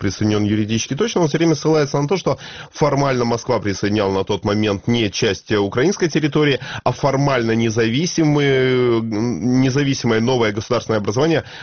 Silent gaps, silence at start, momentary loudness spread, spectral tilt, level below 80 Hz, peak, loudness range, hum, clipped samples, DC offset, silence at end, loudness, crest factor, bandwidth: none; 0 s; 4 LU; -5 dB/octave; -46 dBFS; -2 dBFS; 2 LU; none; under 0.1%; 0.2%; 0 s; -18 LUFS; 14 dB; 6.8 kHz